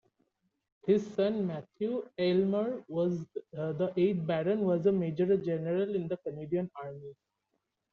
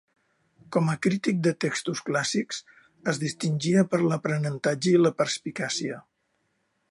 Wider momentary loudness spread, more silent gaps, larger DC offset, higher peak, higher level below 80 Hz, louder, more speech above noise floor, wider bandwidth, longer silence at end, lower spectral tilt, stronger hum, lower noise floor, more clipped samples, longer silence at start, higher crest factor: first, 11 LU vs 8 LU; neither; neither; second, -14 dBFS vs -8 dBFS; about the same, -72 dBFS vs -72 dBFS; second, -31 LUFS vs -26 LUFS; about the same, 51 dB vs 49 dB; second, 7 kHz vs 11.5 kHz; about the same, 0.8 s vs 0.9 s; first, -7.5 dB/octave vs -5 dB/octave; neither; first, -82 dBFS vs -74 dBFS; neither; first, 0.85 s vs 0.7 s; about the same, 18 dB vs 18 dB